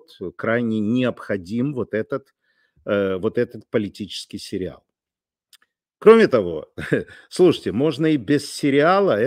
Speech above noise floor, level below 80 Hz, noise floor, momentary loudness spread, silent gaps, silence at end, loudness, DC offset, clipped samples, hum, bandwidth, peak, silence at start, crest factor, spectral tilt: over 70 dB; -58 dBFS; under -90 dBFS; 15 LU; none; 0 s; -20 LUFS; under 0.1%; under 0.1%; none; 14.5 kHz; 0 dBFS; 0.2 s; 20 dB; -6 dB/octave